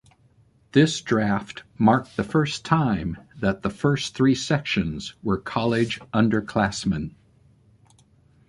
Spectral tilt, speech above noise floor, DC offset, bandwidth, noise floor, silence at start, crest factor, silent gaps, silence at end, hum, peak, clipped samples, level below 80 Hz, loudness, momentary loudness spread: -6 dB/octave; 36 dB; under 0.1%; 11.5 kHz; -59 dBFS; 0.75 s; 20 dB; none; 1.4 s; none; -4 dBFS; under 0.1%; -48 dBFS; -23 LUFS; 8 LU